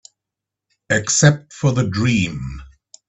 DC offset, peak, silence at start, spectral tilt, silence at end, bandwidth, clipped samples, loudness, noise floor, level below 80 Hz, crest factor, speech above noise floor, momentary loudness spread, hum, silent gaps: under 0.1%; 0 dBFS; 0.9 s; -4.5 dB/octave; 0.4 s; 8.4 kHz; under 0.1%; -17 LUFS; -84 dBFS; -44 dBFS; 20 dB; 67 dB; 16 LU; none; none